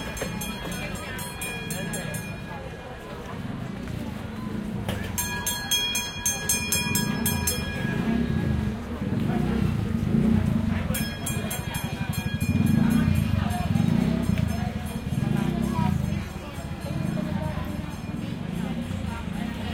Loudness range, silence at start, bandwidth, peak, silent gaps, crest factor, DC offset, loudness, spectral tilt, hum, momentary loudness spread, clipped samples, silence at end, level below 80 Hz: 8 LU; 0 s; 16.5 kHz; -10 dBFS; none; 18 dB; under 0.1%; -27 LUFS; -4.5 dB/octave; none; 11 LU; under 0.1%; 0 s; -38 dBFS